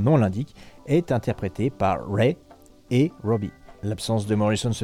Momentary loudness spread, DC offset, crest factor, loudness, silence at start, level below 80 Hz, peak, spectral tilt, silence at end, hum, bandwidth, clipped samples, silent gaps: 12 LU; under 0.1%; 18 dB; -24 LUFS; 0 s; -50 dBFS; -6 dBFS; -7 dB/octave; 0 s; none; 14.5 kHz; under 0.1%; none